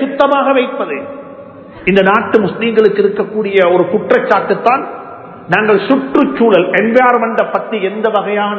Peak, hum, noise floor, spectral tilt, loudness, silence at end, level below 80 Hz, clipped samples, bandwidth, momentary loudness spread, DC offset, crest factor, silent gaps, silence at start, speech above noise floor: 0 dBFS; none; -32 dBFS; -7.5 dB/octave; -12 LUFS; 0 s; -52 dBFS; 0.3%; 7 kHz; 11 LU; under 0.1%; 12 dB; none; 0 s; 21 dB